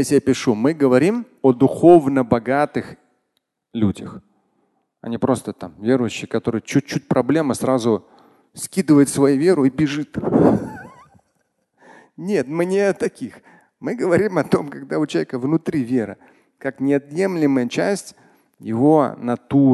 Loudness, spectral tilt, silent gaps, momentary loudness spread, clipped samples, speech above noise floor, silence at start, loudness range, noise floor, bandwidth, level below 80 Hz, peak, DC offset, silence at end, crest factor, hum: -19 LUFS; -6.5 dB/octave; none; 15 LU; under 0.1%; 54 dB; 0 s; 7 LU; -72 dBFS; 12.5 kHz; -52 dBFS; 0 dBFS; under 0.1%; 0 s; 18 dB; none